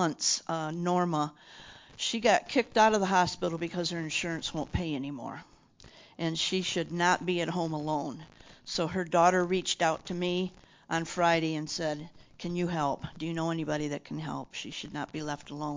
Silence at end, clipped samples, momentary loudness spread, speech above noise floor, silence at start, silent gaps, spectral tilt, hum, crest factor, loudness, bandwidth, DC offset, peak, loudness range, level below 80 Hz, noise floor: 0 s; under 0.1%; 13 LU; 25 dB; 0 s; none; -4 dB/octave; none; 20 dB; -30 LUFS; 7.8 kHz; under 0.1%; -10 dBFS; 6 LU; -56 dBFS; -56 dBFS